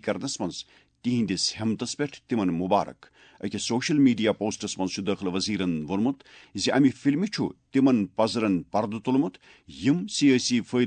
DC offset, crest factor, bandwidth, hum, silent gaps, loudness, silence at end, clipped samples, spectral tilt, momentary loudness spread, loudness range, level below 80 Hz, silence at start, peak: under 0.1%; 18 dB; 9.4 kHz; none; none; -26 LUFS; 0 s; under 0.1%; -5 dB/octave; 10 LU; 3 LU; -64 dBFS; 0.05 s; -8 dBFS